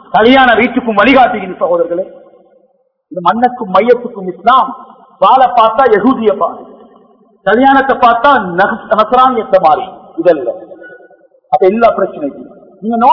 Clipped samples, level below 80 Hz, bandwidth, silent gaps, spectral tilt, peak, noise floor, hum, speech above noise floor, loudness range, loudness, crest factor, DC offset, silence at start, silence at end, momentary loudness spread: 1%; -46 dBFS; 5.4 kHz; none; -7 dB/octave; 0 dBFS; -55 dBFS; none; 46 dB; 4 LU; -10 LUFS; 10 dB; under 0.1%; 0.15 s; 0 s; 13 LU